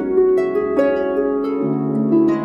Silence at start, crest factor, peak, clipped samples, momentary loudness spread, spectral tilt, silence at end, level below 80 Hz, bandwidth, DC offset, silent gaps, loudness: 0 s; 12 dB; -4 dBFS; under 0.1%; 4 LU; -9.5 dB/octave; 0 s; -50 dBFS; 7 kHz; under 0.1%; none; -18 LUFS